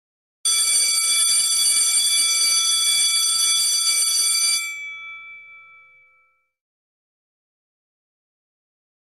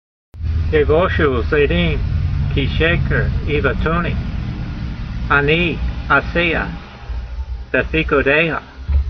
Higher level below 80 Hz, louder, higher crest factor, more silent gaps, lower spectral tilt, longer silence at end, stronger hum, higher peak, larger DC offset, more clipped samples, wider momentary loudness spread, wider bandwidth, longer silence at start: second, -70 dBFS vs -24 dBFS; about the same, -16 LUFS vs -17 LUFS; about the same, 14 dB vs 16 dB; neither; second, 5 dB/octave vs -8 dB/octave; first, 3.55 s vs 0 s; neither; second, -8 dBFS vs 0 dBFS; neither; neither; about the same, 13 LU vs 12 LU; first, 15.5 kHz vs 6.2 kHz; about the same, 0.45 s vs 0.35 s